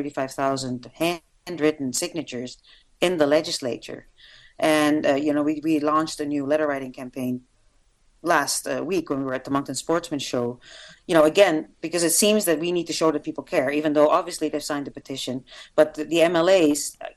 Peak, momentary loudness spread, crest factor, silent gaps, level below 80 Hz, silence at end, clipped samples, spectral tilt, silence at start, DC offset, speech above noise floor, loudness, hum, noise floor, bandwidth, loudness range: -2 dBFS; 14 LU; 22 dB; none; -60 dBFS; 0.05 s; under 0.1%; -3.5 dB/octave; 0 s; under 0.1%; 38 dB; -23 LUFS; none; -61 dBFS; 14.5 kHz; 5 LU